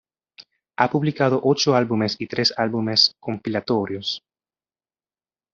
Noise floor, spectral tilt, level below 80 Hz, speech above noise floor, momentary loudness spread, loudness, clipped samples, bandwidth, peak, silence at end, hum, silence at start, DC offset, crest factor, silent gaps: under -90 dBFS; -3.5 dB/octave; -64 dBFS; over 69 dB; 10 LU; -21 LUFS; under 0.1%; 7.6 kHz; -2 dBFS; 1.35 s; none; 0.4 s; under 0.1%; 20 dB; none